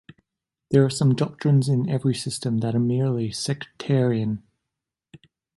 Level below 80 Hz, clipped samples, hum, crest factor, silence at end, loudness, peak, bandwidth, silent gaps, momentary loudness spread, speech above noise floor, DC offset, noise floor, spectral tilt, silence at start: -60 dBFS; under 0.1%; none; 18 dB; 1.2 s; -23 LUFS; -6 dBFS; 11.5 kHz; none; 8 LU; 63 dB; under 0.1%; -85 dBFS; -6.5 dB/octave; 0.7 s